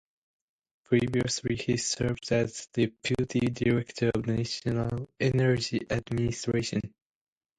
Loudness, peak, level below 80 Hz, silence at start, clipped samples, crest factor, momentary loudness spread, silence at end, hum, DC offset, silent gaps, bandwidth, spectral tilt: -29 LUFS; -10 dBFS; -52 dBFS; 0.9 s; under 0.1%; 18 dB; 5 LU; 0.7 s; none; under 0.1%; none; 10.5 kHz; -5.5 dB/octave